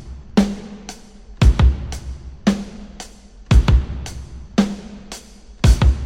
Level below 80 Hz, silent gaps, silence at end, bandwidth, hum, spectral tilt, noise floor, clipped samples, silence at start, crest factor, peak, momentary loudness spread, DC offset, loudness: -20 dBFS; none; 0 s; 11 kHz; none; -6.5 dB/octave; -40 dBFS; under 0.1%; 0 s; 18 dB; 0 dBFS; 21 LU; under 0.1%; -19 LUFS